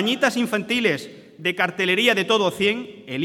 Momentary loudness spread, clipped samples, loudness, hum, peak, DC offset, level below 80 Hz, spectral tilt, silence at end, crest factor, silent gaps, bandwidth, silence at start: 11 LU; under 0.1%; -21 LUFS; none; -4 dBFS; under 0.1%; -66 dBFS; -4 dB/octave; 0 s; 18 dB; none; 17 kHz; 0 s